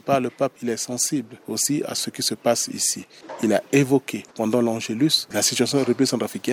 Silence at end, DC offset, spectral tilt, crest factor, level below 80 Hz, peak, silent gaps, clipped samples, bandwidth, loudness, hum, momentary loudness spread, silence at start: 0 s; under 0.1%; -3.5 dB/octave; 18 dB; -66 dBFS; -6 dBFS; none; under 0.1%; 17 kHz; -22 LUFS; none; 8 LU; 0.05 s